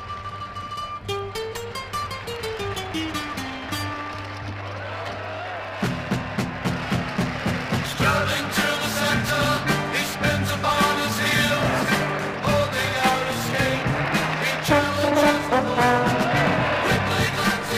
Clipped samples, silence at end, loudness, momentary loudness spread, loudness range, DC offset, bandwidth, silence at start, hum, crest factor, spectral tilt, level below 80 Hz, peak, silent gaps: under 0.1%; 0 s; -23 LUFS; 11 LU; 9 LU; under 0.1%; 15.5 kHz; 0 s; none; 20 dB; -4.5 dB/octave; -44 dBFS; -4 dBFS; none